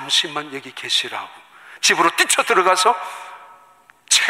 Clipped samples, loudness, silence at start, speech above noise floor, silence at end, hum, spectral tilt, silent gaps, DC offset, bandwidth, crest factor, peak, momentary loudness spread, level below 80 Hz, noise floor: under 0.1%; -17 LUFS; 0 s; 32 dB; 0 s; none; 0 dB/octave; none; under 0.1%; 16 kHz; 18 dB; -2 dBFS; 17 LU; -70 dBFS; -51 dBFS